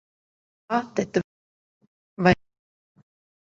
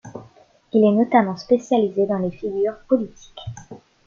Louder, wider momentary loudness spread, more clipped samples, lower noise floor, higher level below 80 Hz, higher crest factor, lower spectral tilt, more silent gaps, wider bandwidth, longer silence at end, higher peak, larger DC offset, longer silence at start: second, -25 LUFS vs -20 LUFS; second, 7 LU vs 20 LU; neither; first, under -90 dBFS vs -52 dBFS; about the same, -54 dBFS vs -56 dBFS; first, 24 dB vs 18 dB; about the same, -6.5 dB/octave vs -7.5 dB/octave; first, 1.24-1.81 s, 1.87-2.17 s vs none; about the same, 7.6 kHz vs 7.2 kHz; first, 1.15 s vs 0.3 s; about the same, -4 dBFS vs -4 dBFS; neither; first, 0.7 s vs 0.05 s